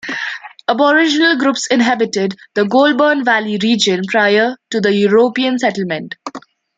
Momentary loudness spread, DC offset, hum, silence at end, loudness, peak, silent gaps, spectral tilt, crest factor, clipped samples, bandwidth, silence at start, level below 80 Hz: 10 LU; under 0.1%; none; 0.4 s; -14 LUFS; -2 dBFS; none; -4 dB/octave; 14 dB; under 0.1%; 9.4 kHz; 0.05 s; -64 dBFS